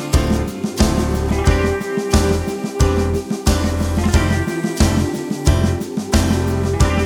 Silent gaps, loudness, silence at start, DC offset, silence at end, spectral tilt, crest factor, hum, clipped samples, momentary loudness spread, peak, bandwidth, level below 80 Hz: none; -18 LUFS; 0 s; under 0.1%; 0 s; -5.5 dB/octave; 16 dB; none; under 0.1%; 4 LU; 0 dBFS; 17.5 kHz; -22 dBFS